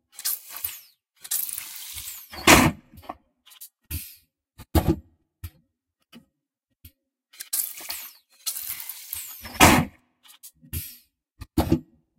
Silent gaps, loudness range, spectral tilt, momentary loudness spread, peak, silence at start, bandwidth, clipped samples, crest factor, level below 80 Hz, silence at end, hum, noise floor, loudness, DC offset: none; 10 LU; -3.5 dB/octave; 27 LU; 0 dBFS; 0.25 s; 17 kHz; under 0.1%; 28 dB; -40 dBFS; 0.35 s; none; -80 dBFS; -24 LUFS; under 0.1%